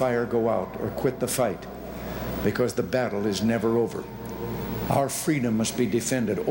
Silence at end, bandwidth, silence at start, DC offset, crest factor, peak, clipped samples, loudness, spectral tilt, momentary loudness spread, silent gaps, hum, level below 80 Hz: 0 s; 17 kHz; 0 s; under 0.1%; 18 dB; -8 dBFS; under 0.1%; -26 LUFS; -5 dB/octave; 10 LU; none; none; -48 dBFS